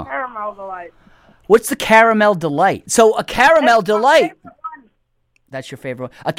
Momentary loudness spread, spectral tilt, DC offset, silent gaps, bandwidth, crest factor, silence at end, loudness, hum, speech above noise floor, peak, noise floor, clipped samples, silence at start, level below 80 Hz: 21 LU; -3.5 dB/octave; under 0.1%; none; 16.5 kHz; 16 dB; 0.05 s; -14 LUFS; none; 48 dB; 0 dBFS; -63 dBFS; under 0.1%; 0 s; -50 dBFS